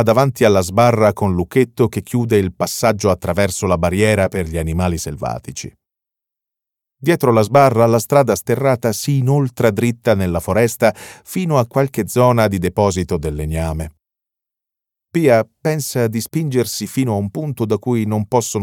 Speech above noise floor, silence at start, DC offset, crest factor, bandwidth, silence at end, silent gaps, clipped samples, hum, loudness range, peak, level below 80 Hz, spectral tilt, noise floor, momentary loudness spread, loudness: 69 dB; 0 s; under 0.1%; 16 dB; 18 kHz; 0 s; none; under 0.1%; none; 5 LU; 0 dBFS; -38 dBFS; -6 dB/octave; -85 dBFS; 9 LU; -17 LUFS